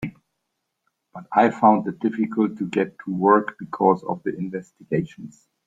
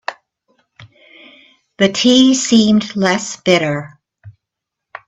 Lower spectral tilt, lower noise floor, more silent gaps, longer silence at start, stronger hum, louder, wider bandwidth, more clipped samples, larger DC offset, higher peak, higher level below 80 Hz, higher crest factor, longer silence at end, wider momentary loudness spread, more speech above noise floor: first, -8.5 dB/octave vs -4 dB/octave; about the same, -78 dBFS vs -80 dBFS; neither; about the same, 0 s vs 0.1 s; neither; second, -22 LUFS vs -13 LUFS; about the same, 7.8 kHz vs 8.4 kHz; neither; neither; about the same, -2 dBFS vs 0 dBFS; second, -62 dBFS vs -56 dBFS; about the same, 20 dB vs 16 dB; second, 0.4 s vs 0.8 s; first, 16 LU vs 10 LU; second, 56 dB vs 68 dB